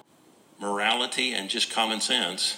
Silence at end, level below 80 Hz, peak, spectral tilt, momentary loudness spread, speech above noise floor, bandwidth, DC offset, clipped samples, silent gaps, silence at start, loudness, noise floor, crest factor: 0 s; -86 dBFS; -8 dBFS; -1 dB/octave; 4 LU; 31 dB; 16 kHz; under 0.1%; under 0.1%; none; 0.6 s; -25 LUFS; -58 dBFS; 20 dB